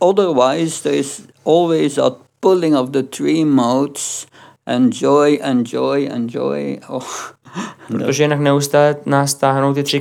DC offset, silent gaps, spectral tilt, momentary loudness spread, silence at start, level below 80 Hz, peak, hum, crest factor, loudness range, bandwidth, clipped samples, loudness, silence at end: under 0.1%; none; -5 dB/octave; 12 LU; 0 s; -72 dBFS; -2 dBFS; none; 14 dB; 3 LU; 17.5 kHz; under 0.1%; -16 LUFS; 0 s